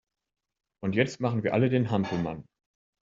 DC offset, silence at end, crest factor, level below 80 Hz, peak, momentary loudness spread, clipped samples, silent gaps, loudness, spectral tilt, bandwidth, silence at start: under 0.1%; 0.6 s; 22 dB; -62 dBFS; -6 dBFS; 10 LU; under 0.1%; none; -28 LUFS; -6.5 dB/octave; 7.6 kHz; 0.8 s